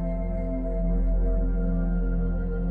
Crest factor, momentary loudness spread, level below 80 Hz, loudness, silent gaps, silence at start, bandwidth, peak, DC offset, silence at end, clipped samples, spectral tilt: 8 dB; 3 LU; -26 dBFS; -28 LUFS; none; 0 s; 2.2 kHz; -16 dBFS; under 0.1%; 0 s; under 0.1%; -12.5 dB/octave